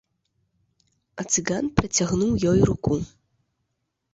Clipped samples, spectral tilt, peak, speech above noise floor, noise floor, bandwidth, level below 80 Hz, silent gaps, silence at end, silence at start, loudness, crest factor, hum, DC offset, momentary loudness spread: under 0.1%; -5 dB/octave; -2 dBFS; 55 dB; -78 dBFS; 8 kHz; -44 dBFS; none; 1.05 s; 1.15 s; -23 LUFS; 24 dB; none; under 0.1%; 15 LU